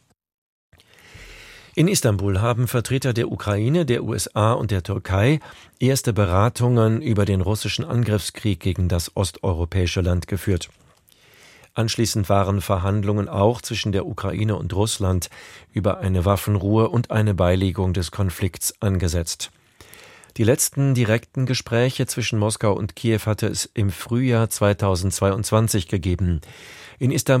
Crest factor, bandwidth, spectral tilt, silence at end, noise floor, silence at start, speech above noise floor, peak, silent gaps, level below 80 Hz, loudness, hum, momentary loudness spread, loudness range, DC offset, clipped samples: 18 dB; 16.5 kHz; -5.5 dB/octave; 0 s; -54 dBFS; 1.15 s; 34 dB; -2 dBFS; none; -42 dBFS; -21 LUFS; none; 6 LU; 3 LU; under 0.1%; under 0.1%